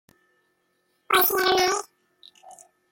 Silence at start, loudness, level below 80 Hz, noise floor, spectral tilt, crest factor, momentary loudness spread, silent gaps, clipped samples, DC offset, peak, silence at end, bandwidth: 1.1 s; -21 LUFS; -62 dBFS; -71 dBFS; -1 dB/octave; 20 dB; 6 LU; none; under 0.1%; under 0.1%; -8 dBFS; 0.4 s; 17 kHz